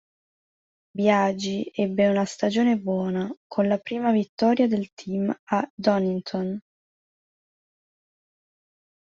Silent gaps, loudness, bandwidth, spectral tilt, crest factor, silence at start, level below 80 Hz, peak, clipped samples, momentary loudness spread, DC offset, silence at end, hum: 3.37-3.50 s, 4.29-4.37 s, 4.92-4.97 s, 5.39-5.47 s, 5.70-5.77 s; -24 LUFS; 7.8 kHz; -6.5 dB/octave; 18 dB; 0.95 s; -66 dBFS; -6 dBFS; under 0.1%; 9 LU; under 0.1%; 2.4 s; none